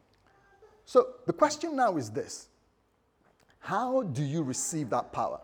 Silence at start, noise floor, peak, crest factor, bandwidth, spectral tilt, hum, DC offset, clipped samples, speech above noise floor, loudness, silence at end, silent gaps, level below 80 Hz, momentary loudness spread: 0.65 s; -71 dBFS; -10 dBFS; 22 dB; 19 kHz; -5 dB/octave; none; under 0.1%; under 0.1%; 41 dB; -30 LUFS; 0 s; none; -70 dBFS; 11 LU